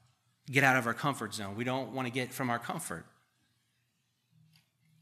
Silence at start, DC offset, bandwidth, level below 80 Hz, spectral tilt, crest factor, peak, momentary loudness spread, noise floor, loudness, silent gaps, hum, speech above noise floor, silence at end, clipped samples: 0.45 s; under 0.1%; 15 kHz; -78 dBFS; -4.5 dB/octave; 26 dB; -10 dBFS; 12 LU; -77 dBFS; -32 LUFS; none; none; 45 dB; 2 s; under 0.1%